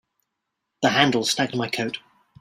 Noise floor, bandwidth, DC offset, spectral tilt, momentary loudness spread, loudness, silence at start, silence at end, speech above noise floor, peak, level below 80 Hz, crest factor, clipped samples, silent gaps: -80 dBFS; 16 kHz; under 0.1%; -3.5 dB/octave; 10 LU; -22 LUFS; 0.8 s; 0.45 s; 58 dB; -2 dBFS; -64 dBFS; 24 dB; under 0.1%; none